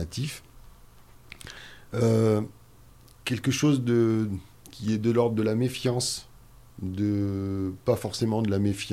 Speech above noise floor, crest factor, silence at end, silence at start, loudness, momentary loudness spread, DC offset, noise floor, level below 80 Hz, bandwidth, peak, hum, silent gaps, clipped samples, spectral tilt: 27 dB; 16 dB; 0 s; 0 s; -27 LUFS; 16 LU; under 0.1%; -52 dBFS; -54 dBFS; 15.5 kHz; -10 dBFS; none; none; under 0.1%; -6 dB/octave